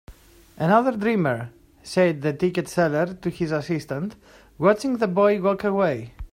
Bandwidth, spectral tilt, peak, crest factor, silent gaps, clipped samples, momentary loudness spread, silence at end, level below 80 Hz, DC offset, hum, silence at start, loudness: 16 kHz; -7 dB/octave; -4 dBFS; 18 dB; none; under 0.1%; 10 LU; 0.05 s; -50 dBFS; under 0.1%; none; 0.1 s; -23 LUFS